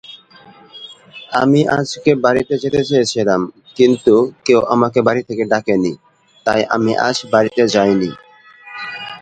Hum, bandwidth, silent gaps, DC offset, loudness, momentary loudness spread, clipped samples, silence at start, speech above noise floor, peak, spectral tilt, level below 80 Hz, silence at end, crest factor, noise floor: none; 9.2 kHz; none; under 0.1%; -15 LUFS; 14 LU; under 0.1%; 0.1 s; 29 dB; 0 dBFS; -5.5 dB/octave; -52 dBFS; 0.05 s; 16 dB; -44 dBFS